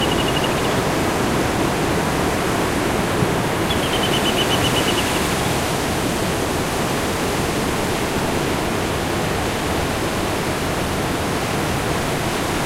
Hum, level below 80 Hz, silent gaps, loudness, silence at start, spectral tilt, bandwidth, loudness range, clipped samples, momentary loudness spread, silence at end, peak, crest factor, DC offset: none; -34 dBFS; none; -20 LUFS; 0 s; -4 dB/octave; 16 kHz; 3 LU; under 0.1%; 4 LU; 0 s; -4 dBFS; 16 dB; under 0.1%